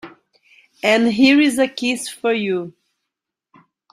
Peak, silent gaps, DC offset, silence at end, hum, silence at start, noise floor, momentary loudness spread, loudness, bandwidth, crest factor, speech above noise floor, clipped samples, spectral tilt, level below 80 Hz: -2 dBFS; none; under 0.1%; 1.2 s; none; 0.05 s; -82 dBFS; 10 LU; -17 LUFS; 13.5 kHz; 18 dB; 65 dB; under 0.1%; -4 dB/octave; -64 dBFS